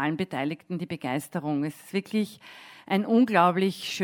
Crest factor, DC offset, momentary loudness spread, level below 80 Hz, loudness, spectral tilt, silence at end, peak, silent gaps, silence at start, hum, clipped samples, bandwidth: 20 dB; under 0.1%; 13 LU; -74 dBFS; -27 LUFS; -6 dB/octave; 0 s; -6 dBFS; none; 0 s; none; under 0.1%; 18 kHz